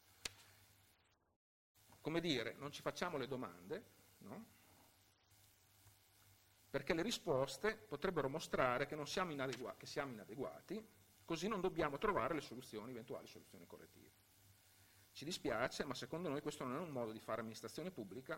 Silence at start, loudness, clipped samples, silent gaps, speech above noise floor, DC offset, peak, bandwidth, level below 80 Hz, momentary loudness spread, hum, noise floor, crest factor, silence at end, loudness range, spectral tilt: 0.2 s; -44 LUFS; under 0.1%; 1.36-1.75 s; 32 dB; under 0.1%; -18 dBFS; 16 kHz; -70 dBFS; 17 LU; none; -77 dBFS; 26 dB; 0 s; 9 LU; -4.5 dB/octave